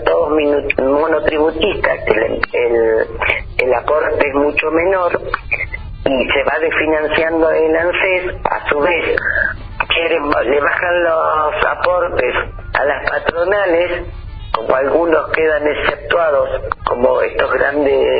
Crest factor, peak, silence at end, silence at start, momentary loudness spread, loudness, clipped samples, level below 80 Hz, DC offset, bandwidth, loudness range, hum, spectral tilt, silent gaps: 14 dB; 0 dBFS; 0 s; 0 s; 6 LU; -15 LUFS; under 0.1%; -34 dBFS; under 0.1%; 5 kHz; 1 LU; none; -8.5 dB/octave; none